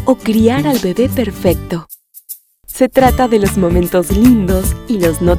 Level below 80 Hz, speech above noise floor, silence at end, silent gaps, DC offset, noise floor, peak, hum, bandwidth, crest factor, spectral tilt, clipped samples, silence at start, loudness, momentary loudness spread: -24 dBFS; 23 dB; 0 s; none; under 0.1%; -35 dBFS; 0 dBFS; none; 17.5 kHz; 12 dB; -6 dB/octave; 0.1%; 0 s; -13 LUFS; 15 LU